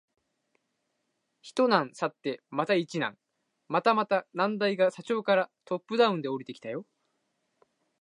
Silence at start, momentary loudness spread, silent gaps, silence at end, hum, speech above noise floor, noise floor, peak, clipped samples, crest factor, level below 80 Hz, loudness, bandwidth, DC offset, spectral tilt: 1.45 s; 11 LU; none; 1.2 s; none; 51 dB; -79 dBFS; -8 dBFS; under 0.1%; 22 dB; -84 dBFS; -28 LUFS; 11 kHz; under 0.1%; -5.5 dB/octave